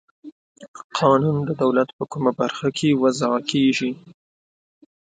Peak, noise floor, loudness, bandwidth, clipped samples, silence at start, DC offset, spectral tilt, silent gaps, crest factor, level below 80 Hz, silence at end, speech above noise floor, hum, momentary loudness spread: -2 dBFS; under -90 dBFS; -21 LUFS; 9.4 kHz; under 0.1%; 0.25 s; under 0.1%; -6 dB/octave; 0.32-0.55 s, 0.68-0.74 s, 0.84-0.90 s, 1.93-1.99 s; 20 dB; -62 dBFS; 1.2 s; over 70 dB; none; 9 LU